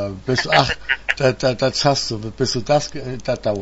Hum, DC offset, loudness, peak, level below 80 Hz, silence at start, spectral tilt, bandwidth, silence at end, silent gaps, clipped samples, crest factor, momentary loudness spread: none; under 0.1%; -19 LUFS; 0 dBFS; -42 dBFS; 0 s; -4 dB/octave; 8 kHz; 0 s; none; under 0.1%; 20 dB; 8 LU